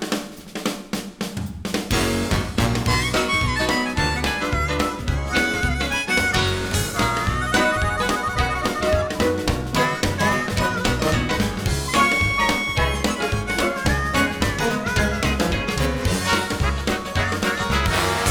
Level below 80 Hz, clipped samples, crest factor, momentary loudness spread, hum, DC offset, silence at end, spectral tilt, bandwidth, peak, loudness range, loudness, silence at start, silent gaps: -30 dBFS; under 0.1%; 16 dB; 5 LU; none; under 0.1%; 0 s; -4 dB/octave; over 20 kHz; -4 dBFS; 1 LU; -21 LUFS; 0 s; none